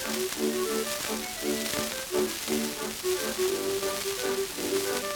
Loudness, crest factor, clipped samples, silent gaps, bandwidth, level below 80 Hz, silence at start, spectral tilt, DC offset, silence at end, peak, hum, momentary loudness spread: -29 LUFS; 18 dB; under 0.1%; none; over 20 kHz; -58 dBFS; 0 s; -2 dB/octave; under 0.1%; 0 s; -12 dBFS; none; 2 LU